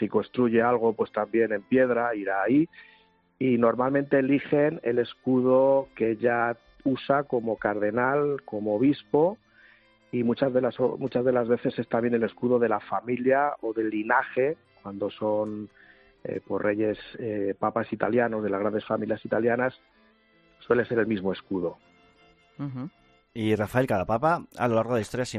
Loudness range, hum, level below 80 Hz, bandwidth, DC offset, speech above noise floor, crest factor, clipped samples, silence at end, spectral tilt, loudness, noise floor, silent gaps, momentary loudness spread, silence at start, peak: 5 LU; none; -62 dBFS; 11 kHz; under 0.1%; 36 dB; 18 dB; under 0.1%; 0 s; -7.5 dB/octave; -26 LUFS; -62 dBFS; none; 9 LU; 0 s; -8 dBFS